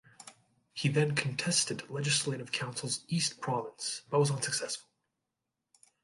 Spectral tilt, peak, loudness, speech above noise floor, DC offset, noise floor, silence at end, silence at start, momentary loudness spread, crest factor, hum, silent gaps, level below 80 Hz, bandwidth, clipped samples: -3.5 dB/octave; -14 dBFS; -32 LUFS; 55 dB; under 0.1%; -87 dBFS; 1.25 s; 0.2 s; 11 LU; 20 dB; none; none; -72 dBFS; 11.5 kHz; under 0.1%